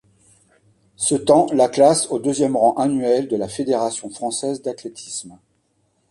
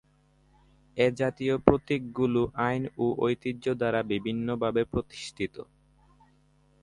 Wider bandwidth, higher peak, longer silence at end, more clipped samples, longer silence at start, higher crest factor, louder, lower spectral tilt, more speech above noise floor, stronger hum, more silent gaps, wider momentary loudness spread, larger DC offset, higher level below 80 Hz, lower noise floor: about the same, 11.5 kHz vs 11 kHz; about the same, -2 dBFS vs 0 dBFS; second, 0.75 s vs 1.2 s; neither; about the same, 1 s vs 0.95 s; second, 18 dB vs 28 dB; first, -19 LUFS vs -28 LUFS; second, -4.5 dB/octave vs -7 dB/octave; first, 47 dB vs 36 dB; neither; neither; first, 15 LU vs 11 LU; neither; second, -60 dBFS vs -52 dBFS; about the same, -66 dBFS vs -64 dBFS